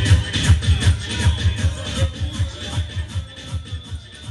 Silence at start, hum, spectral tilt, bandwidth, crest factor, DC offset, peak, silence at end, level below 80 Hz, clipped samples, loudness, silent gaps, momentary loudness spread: 0 s; none; -4.5 dB/octave; 11.5 kHz; 18 dB; under 0.1%; -2 dBFS; 0 s; -26 dBFS; under 0.1%; -21 LUFS; none; 14 LU